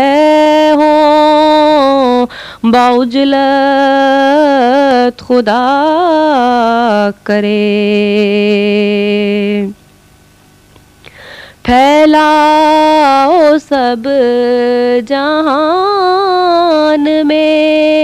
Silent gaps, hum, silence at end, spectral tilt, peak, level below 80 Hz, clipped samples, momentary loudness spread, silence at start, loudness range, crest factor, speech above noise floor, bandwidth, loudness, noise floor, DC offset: none; 50 Hz at -40 dBFS; 0 s; -5.5 dB/octave; 0 dBFS; -44 dBFS; under 0.1%; 5 LU; 0 s; 4 LU; 8 dB; 34 dB; 13 kHz; -9 LUFS; -43 dBFS; under 0.1%